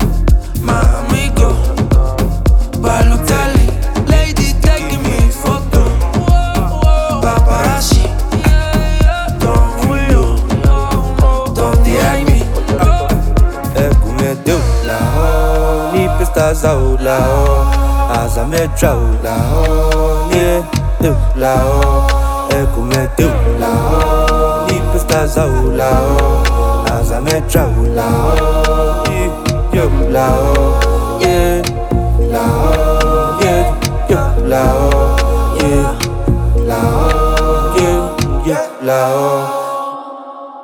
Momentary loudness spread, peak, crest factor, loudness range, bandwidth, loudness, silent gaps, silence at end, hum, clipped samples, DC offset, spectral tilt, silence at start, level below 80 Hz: 4 LU; 0 dBFS; 12 dB; 1 LU; 17 kHz; -13 LUFS; none; 0 s; none; under 0.1%; under 0.1%; -6 dB/octave; 0 s; -14 dBFS